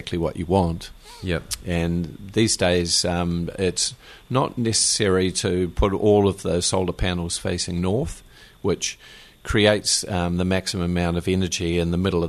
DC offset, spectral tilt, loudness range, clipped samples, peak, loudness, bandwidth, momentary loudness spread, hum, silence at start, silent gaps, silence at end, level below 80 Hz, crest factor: under 0.1%; -4 dB/octave; 3 LU; under 0.1%; -2 dBFS; -22 LUFS; 13.5 kHz; 9 LU; none; 0 s; none; 0 s; -38 dBFS; 20 dB